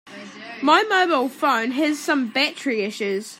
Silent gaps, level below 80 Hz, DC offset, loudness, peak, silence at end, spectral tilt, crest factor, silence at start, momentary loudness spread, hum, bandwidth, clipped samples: none; -80 dBFS; under 0.1%; -20 LUFS; -2 dBFS; 0.05 s; -3 dB/octave; 18 dB; 0.05 s; 10 LU; none; 16 kHz; under 0.1%